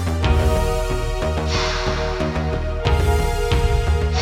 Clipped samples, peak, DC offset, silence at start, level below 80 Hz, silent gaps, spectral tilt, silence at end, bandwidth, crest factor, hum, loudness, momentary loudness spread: under 0.1%; -4 dBFS; under 0.1%; 0 s; -22 dBFS; none; -5.5 dB/octave; 0 s; 15.5 kHz; 14 dB; none; -21 LUFS; 5 LU